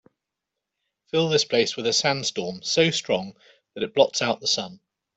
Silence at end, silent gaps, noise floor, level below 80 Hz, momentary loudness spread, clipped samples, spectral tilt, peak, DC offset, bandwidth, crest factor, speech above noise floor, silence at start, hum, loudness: 0.4 s; none; -85 dBFS; -66 dBFS; 10 LU; under 0.1%; -3 dB/octave; -4 dBFS; under 0.1%; 8.4 kHz; 22 dB; 61 dB; 1.15 s; none; -23 LUFS